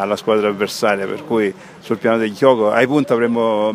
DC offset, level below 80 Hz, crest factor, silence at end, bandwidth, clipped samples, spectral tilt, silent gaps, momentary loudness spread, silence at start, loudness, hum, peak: under 0.1%; -64 dBFS; 16 dB; 0 s; 15.5 kHz; under 0.1%; -5.5 dB/octave; none; 7 LU; 0 s; -17 LUFS; none; 0 dBFS